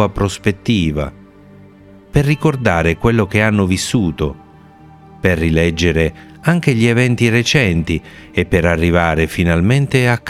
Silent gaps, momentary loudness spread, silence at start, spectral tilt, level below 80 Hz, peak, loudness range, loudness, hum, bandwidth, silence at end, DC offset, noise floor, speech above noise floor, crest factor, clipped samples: none; 7 LU; 0 s; -6 dB/octave; -34 dBFS; 0 dBFS; 3 LU; -15 LUFS; none; 15 kHz; 0 s; under 0.1%; -41 dBFS; 27 dB; 14 dB; under 0.1%